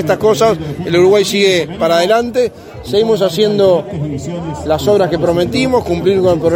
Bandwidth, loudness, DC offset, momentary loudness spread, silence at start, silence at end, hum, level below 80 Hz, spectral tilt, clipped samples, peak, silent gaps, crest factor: 16.5 kHz; -13 LUFS; under 0.1%; 10 LU; 0 s; 0 s; none; -40 dBFS; -5.5 dB/octave; under 0.1%; 0 dBFS; none; 12 dB